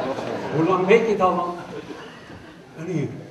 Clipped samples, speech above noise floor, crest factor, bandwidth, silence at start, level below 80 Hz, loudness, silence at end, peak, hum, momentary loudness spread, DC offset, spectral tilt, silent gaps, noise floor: under 0.1%; 22 dB; 20 dB; 12 kHz; 0 s; -58 dBFS; -21 LUFS; 0 s; -2 dBFS; none; 24 LU; under 0.1%; -6.5 dB/octave; none; -42 dBFS